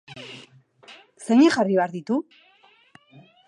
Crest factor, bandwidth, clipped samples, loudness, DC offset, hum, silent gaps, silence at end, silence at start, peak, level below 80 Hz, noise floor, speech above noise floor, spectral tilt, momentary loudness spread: 18 dB; 11.5 kHz; under 0.1%; -21 LUFS; under 0.1%; none; none; 1.25 s; 0.1 s; -6 dBFS; -74 dBFS; -55 dBFS; 35 dB; -5.5 dB/octave; 24 LU